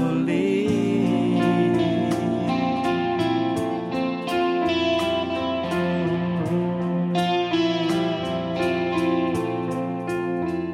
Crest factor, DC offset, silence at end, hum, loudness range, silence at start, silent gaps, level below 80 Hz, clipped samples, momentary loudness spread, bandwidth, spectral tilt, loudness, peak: 14 dB; under 0.1%; 0 s; none; 2 LU; 0 s; none; -54 dBFS; under 0.1%; 5 LU; 13 kHz; -6.5 dB/octave; -23 LUFS; -10 dBFS